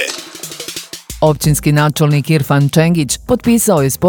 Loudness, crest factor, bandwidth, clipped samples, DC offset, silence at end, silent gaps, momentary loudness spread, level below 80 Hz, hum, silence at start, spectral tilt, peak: -13 LUFS; 12 dB; 19 kHz; under 0.1%; under 0.1%; 0 s; none; 14 LU; -36 dBFS; none; 0 s; -5.5 dB/octave; 0 dBFS